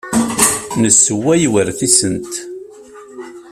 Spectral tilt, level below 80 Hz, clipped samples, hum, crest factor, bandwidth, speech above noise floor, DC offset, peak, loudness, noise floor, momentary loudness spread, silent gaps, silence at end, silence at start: -3 dB/octave; -48 dBFS; under 0.1%; none; 16 dB; over 20 kHz; 23 dB; under 0.1%; 0 dBFS; -12 LUFS; -37 dBFS; 23 LU; none; 0 s; 0.05 s